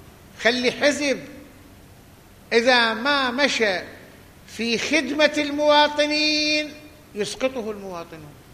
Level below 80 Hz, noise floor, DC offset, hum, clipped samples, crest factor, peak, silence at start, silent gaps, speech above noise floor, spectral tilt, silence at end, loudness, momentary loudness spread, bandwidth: -56 dBFS; -48 dBFS; under 0.1%; none; under 0.1%; 20 dB; -2 dBFS; 0 s; none; 27 dB; -2.5 dB/octave; 0.2 s; -20 LUFS; 17 LU; 15 kHz